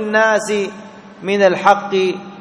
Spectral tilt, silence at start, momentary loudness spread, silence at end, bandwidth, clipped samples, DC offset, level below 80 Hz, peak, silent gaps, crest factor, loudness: -4.5 dB/octave; 0 s; 14 LU; 0 s; 11 kHz; 0.1%; under 0.1%; -60 dBFS; 0 dBFS; none; 16 dB; -15 LUFS